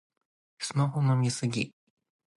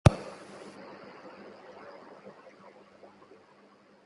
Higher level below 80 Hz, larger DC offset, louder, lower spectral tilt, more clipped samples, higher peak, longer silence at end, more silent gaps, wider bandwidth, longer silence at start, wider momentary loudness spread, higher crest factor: second, -70 dBFS vs -46 dBFS; neither; first, -29 LUFS vs -38 LUFS; second, -5.5 dB/octave vs -7 dB/octave; neither; second, -16 dBFS vs -2 dBFS; second, 0.65 s vs 2.75 s; neither; about the same, 11.5 kHz vs 11.5 kHz; first, 0.6 s vs 0.05 s; about the same, 10 LU vs 12 LU; second, 16 dB vs 32 dB